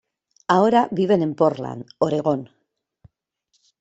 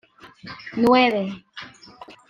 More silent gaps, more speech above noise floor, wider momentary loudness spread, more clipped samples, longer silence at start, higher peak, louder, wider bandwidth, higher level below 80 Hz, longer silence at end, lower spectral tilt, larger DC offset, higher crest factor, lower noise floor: neither; first, 50 dB vs 24 dB; second, 14 LU vs 24 LU; neither; first, 0.5 s vs 0.25 s; about the same, -2 dBFS vs -4 dBFS; about the same, -20 LUFS vs -20 LUFS; second, 8.2 kHz vs 12.5 kHz; about the same, -64 dBFS vs -62 dBFS; first, 1.35 s vs 0.2 s; about the same, -7 dB/octave vs -6 dB/octave; neither; about the same, 20 dB vs 20 dB; first, -70 dBFS vs -45 dBFS